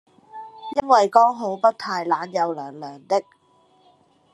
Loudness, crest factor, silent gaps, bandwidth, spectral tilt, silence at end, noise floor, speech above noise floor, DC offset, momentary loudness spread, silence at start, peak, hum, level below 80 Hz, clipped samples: -21 LUFS; 20 dB; none; 11 kHz; -4.5 dB/octave; 1.1 s; -59 dBFS; 38 dB; under 0.1%; 21 LU; 0.35 s; -2 dBFS; none; -68 dBFS; under 0.1%